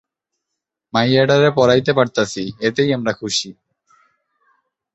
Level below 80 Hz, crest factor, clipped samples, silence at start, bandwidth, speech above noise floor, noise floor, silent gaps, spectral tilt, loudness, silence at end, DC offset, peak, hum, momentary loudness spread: -54 dBFS; 18 dB; under 0.1%; 0.95 s; 8.2 kHz; 64 dB; -80 dBFS; none; -5 dB/octave; -17 LUFS; 1.45 s; under 0.1%; -2 dBFS; none; 9 LU